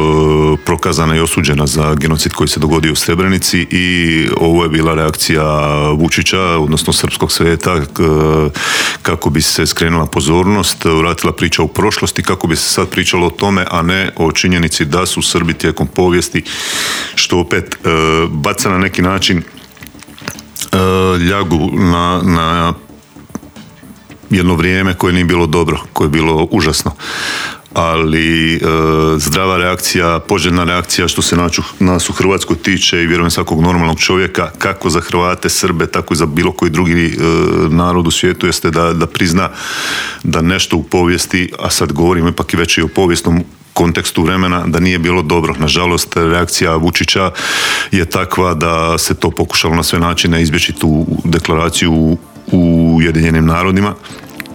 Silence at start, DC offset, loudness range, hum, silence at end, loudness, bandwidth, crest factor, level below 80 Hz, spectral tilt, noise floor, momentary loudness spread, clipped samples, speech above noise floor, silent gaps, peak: 0 s; under 0.1%; 2 LU; none; 0 s; -12 LUFS; over 20 kHz; 12 dB; -32 dBFS; -4.5 dB/octave; -36 dBFS; 4 LU; under 0.1%; 24 dB; none; 0 dBFS